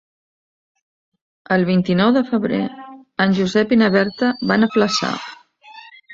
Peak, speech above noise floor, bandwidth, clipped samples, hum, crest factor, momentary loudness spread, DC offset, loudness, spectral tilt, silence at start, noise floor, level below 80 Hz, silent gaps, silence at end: -2 dBFS; 26 dB; 7.8 kHz; under 0.1%; none; 18 dB; 13 LU; under 0.1%; -17 LUFS; -6 dB/octave; 1.5 s; -43 dBFS; -58 dBFS; none; 0 s